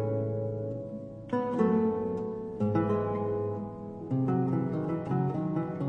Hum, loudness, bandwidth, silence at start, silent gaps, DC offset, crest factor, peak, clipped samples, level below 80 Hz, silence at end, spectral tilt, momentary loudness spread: none; -31 LUFS; 6.4 kHz; 0 s; none; under 0.1%; 16 dB; -14 dBFS; under 0.1%; -60 dBFS; 0 s; -10.5 dB/octave; 10 LU